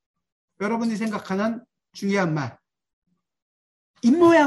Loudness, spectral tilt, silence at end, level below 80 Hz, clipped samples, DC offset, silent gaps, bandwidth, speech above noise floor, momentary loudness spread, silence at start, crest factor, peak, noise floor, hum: -23 LUFS; -6.5 dB/octave; 0 s; -66 dBFS; under 0.1%; under 0.1%; 2.93-3.02 s, 3.42-3.94 s; 12 kHz; over 70 dB; 13 LU; 0.6 s; 18 dB; -6 dBFS; under -90 dBFS; none